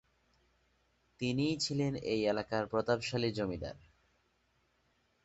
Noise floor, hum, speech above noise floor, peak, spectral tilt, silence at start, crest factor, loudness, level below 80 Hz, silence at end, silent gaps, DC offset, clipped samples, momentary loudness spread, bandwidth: -75 dBFS; none; 41 dB; -16 dBFS; -5 dB/octave; 1.2 s; 22 dB; -35 LUFS; -62 dBFS; 1.45 s; none; under 0.1%; under 0.1%; 6 LU; 8 kHz